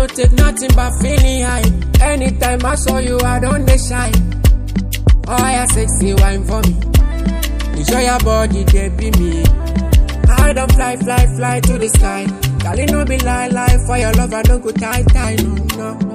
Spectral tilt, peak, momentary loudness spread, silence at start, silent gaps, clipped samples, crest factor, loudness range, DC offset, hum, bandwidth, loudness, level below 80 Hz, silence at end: -5 dB/octave; 0 dBFS; 5 LU; 0 s; none; under 0.1%; 12 dB; 1 LU; under 0.1%; none; 15.5 kHz; -14 LUFS; -14 dBFS; 0 s